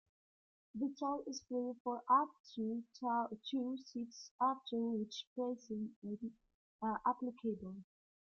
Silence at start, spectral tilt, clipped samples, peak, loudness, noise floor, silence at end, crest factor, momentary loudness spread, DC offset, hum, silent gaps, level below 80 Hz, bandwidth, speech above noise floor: 0.75 s; -4.5 dB/octave; under 0.1%; -20 dBFS; -41 LUFS; under -90 dBFS; 0.45 s; 20 dB; 12 LU; under 0.1%; none; 1.80-1.85 s, 2.40-2.44 s, 4.31-4.39 s, 5.27-5.36 s, 5.96-6.02 s, 6.54-6.79 s; -80 dBFS; 7 kHz; over 50 dB